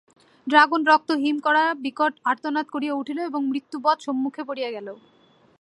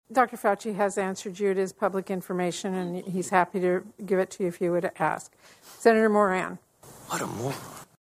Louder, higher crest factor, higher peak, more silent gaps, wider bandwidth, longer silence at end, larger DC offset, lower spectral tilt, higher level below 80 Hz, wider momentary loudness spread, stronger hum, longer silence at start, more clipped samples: first, -22 LUFS vs -27 LUFS; about the same, 22 dB vs 22 dB; first, -2 dBFS vs -6 dBFS; neither; second, 11 kHz vs 15.5 kHz; first, 0.65 s vs 0.2 s; neither; second, -3.5 dB/octave vs -5.5 dB/octave; second, -80 dBFS vs -68 dBFS; about the same, 12 LU vs 11 LU; neither; first, 0.45 s vs 0.1 s; neither